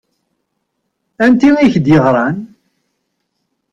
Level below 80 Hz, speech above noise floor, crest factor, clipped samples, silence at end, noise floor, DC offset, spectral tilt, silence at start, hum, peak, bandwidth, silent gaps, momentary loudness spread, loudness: -46 dBFS; 60 dB; 14 dB; under 0.1%; 1.25 s; -70 dBFS; under 0.1%; -7.5 dB/octave; 1.2 s; none; -2 dBFS; 7.6 kHz; none; 8 LU; -11 LUFS